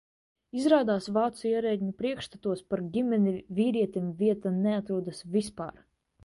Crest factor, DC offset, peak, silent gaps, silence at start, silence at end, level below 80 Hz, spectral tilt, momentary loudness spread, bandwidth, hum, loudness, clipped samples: 20 dB; under 0.1%; -10 dBFS; none; 0.55 s; 0.55 s; -64 dBFS; -7 dB/octave; 9 LU; 11.5 kHz; none; -29 LUFS; under 0.1%